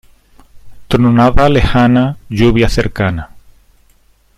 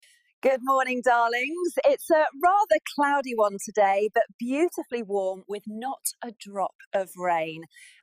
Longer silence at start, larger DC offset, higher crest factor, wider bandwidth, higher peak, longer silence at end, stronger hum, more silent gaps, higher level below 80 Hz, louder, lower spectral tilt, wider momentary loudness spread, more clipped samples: about the same, 0.55 s vs 0.45 s; neither; about the same, 12 dB vs 16 dB; second, 13.5 kHz vs 15.5 kHz; first, 0 dBFS vs -10 dBFS; first, 1 s vs 0.4 s; neither; second, none vs 4.34-4.39 s, 6.75-6.79 s, 6.87-6.91 s; first, -24 dBFS vs -72 dBFS; first, -12 LUFS vs -25 LUFS; first, -7 dB/octave vs -3.5 dB/octave; second, 8 LU vs 11 LU; neither